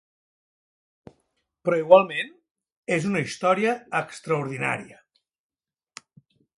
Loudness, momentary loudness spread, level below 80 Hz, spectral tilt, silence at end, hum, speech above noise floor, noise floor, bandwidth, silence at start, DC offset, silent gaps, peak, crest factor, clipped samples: -23 LUFS; 14 LU; -70 dBFS; -5.5 dB/octave; 1.75 s; none; 52 dB; -74 dBFS; 11.5 kHz; 1.65 s; under 0.1%; 2.51-2.55 s, 2.72-2.83 s; 0 dBFS; 26 dB; under 0.1%